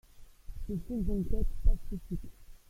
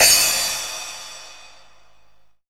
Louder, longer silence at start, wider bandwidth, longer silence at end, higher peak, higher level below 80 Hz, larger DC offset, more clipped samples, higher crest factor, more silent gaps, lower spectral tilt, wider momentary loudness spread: second, -37 LUFS vs -17 LUFS; first, 0.2 s vs 0 s; second, 13.5 kHz vs over 20 kHz; second, 0.15 s vs 1.15 s; second, -12 dBFS vs 0 dBFS; first, -34 dBFS vs -54 dBFS; second, under 0.1% vs 0.5%; neither; about the same, 18 dB vs 22 dB; neither; first, -9 dB/octave vs 2 dB/octave; second, 14 LU vs 24 LU